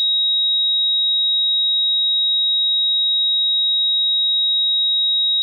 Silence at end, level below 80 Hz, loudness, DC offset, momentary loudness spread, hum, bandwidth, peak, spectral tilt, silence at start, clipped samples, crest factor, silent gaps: 0 s; under -90 dBFS; -14 LUFS; under 0.1%; 0 LU; none; 4.1 kHz; -14 dBFS; 6 dB/octave; 0 s; under 0.1%; 4 dB; none